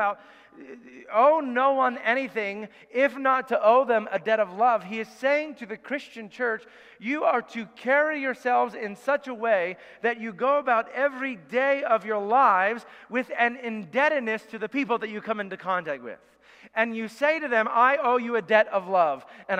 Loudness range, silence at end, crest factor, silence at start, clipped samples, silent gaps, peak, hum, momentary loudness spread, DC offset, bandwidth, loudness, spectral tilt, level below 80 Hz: 4 LU; 0 s; 20 dB; 0 s; under 0.1%; none; -6 dBFS; none; 13 LU; under 0.1%; 10.5 kHz; -25 LUFS; -5 dB/octave; -78 dBFS